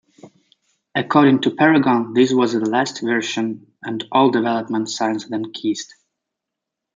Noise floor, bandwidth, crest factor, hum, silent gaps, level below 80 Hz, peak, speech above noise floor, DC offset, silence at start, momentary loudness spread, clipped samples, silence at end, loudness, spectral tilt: -82 dBFS; 9 kHz; 18 dB; none; none; -68 dBFS; -2 dBFS; 65 dB; under 0.1%; 0.25 s; 12 LU; under 0.1%; 1.1 s; -18 LUFS; -5 dB/octave